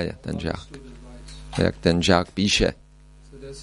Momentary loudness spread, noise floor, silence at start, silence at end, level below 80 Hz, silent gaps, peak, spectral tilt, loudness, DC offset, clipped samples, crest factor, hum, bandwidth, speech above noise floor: 23 LU; -49 dBFS; 0 s; 0 s; -40 dBFS; none; -2 dBFS; -4.5 dB/octave; -22 LUFS; under 0.1%; under 0.1%; 24 dB; none; 11.5 kHz; 26 dB